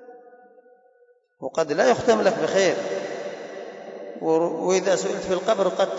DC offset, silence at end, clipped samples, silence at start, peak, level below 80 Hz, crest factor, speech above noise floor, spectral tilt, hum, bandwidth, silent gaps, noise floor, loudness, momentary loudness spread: under 0.1%; 0 s; under 0.1%; 0 s; -8 dBFS; -64 dBFS; 16 dB; 38 dB; -4 dB/octave; none; 8 kHz; none; -59 dBFS; -22 LUFS; 17 LU